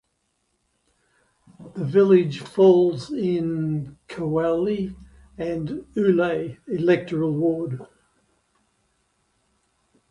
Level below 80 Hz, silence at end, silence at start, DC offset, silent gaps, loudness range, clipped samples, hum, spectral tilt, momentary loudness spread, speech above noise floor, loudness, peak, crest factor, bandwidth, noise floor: -56 dBFS; 2.25 s; 1.6 s; under 0.1%; none; 6 LU; under 0.1%; none; -8.5 dB/octave; 15 LU; 51 dB; -22 LUFS; -4 dBFS; 20 dB; 10.5 kHz; -72 dBFS